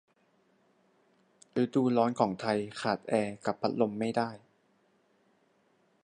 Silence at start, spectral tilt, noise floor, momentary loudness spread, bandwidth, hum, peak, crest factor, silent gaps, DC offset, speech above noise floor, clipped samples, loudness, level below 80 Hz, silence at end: 1.55 s; -6.5 dB/octave; -70 dBFS; 7 LU; 10 kHz; none; -10 dBFS; 22 dB; none; under 0.1%; 40 dB; under 0.1%; -31 LUFS; -74 dBFS; 1.65 s